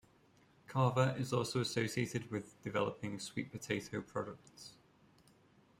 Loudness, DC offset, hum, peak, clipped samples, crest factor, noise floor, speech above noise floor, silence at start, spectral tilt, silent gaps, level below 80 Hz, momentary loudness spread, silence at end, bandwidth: -38 LUFS; under 0.1%; none; -18 dBFS; under 0.1%; 22 dB; -68 dBFS; 30 dB; 0.7 s; -5.5 dB/octave; none; -72 dBFS; 13 LU; 1.1 s; 16 kHz